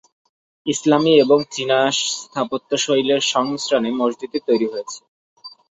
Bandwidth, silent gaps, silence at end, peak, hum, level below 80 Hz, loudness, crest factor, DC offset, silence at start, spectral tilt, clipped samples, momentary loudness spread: 8.2 kHz; 5.08-5.36 s; 0.25 s; -2 dBFS; none; -64 dBFS; -18 LUFS; 18 dB; under 0.1%; 0.65 s; -3.5 dB/octave; under 0.1%; 11 LU